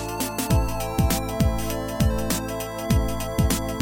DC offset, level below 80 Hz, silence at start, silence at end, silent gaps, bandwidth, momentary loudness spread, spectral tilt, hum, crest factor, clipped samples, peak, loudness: 0.8%; -30 dBFS; 0 s; 0 s; none; 17 kHz; 4 LU; -5 dB/octave; none; 16 dB; under 0.1%; -6 dBFS; -25 LUFS